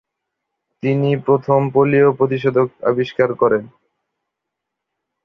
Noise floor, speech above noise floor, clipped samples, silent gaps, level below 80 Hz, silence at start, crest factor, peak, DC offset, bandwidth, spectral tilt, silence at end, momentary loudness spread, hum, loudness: -80 dBFS; 64 dB; under 0.1%; none; -60 dBFS; 0.85 s; 16 dB; -2 dBFS; under 0.1%; 6 kHz; -9.5 dB/octave; 1.55 s; 6 LU; none; -17 LUFS